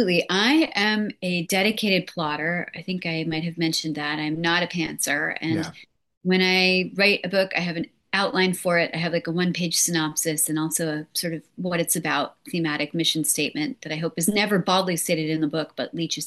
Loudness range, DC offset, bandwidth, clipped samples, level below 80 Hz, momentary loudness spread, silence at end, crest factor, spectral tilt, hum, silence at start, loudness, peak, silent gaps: 3 LU; under 0.1%; 13 kHz; under 0.1%; -66 dBFS; 9 LU; 0 s; 18 dB; -3.5 dB/octave; none; 0 s; -23 LUFS; -6 dBFS; 6.17-6.21 s